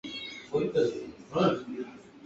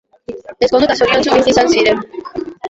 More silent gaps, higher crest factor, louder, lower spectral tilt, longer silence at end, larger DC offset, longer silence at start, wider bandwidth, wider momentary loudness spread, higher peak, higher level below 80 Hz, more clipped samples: neither; first, 18 dB vs 12 dB; second, -31 LUFS vs -12 LUFS; first, -6.5 dB/octave vs -3.5 dB/octave; about the same, 0 s vs 0 s; neither; second, 0.05 s vs 0.3 s; about the same, 8 kHz vs 8 kHz; second, 13 LU vs 18 LU; second, -14 dBFS vs -2 dBFS; second, -64 dBFS vs -44 dBFS; neither